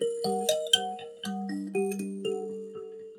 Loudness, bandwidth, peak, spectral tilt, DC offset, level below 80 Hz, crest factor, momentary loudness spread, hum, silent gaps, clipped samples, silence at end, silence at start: -30 LUFS; 18 kHz; -6 dBFS; -3 dB/octave; under 0.1%; -82 dBFS; 24 dB; 14 LU; none; none; under 0.1%; 0 s; 0 s